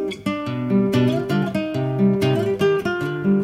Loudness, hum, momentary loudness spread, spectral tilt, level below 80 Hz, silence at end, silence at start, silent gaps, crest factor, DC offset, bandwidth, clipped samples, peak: -21 LUFS; none; 7 LU; -7.5 dB/octave; -52 dBFS; 0 s; 0 s; none; 14 dB; under 0.1%; 15 kHz; under 0.1%; -6 dBFS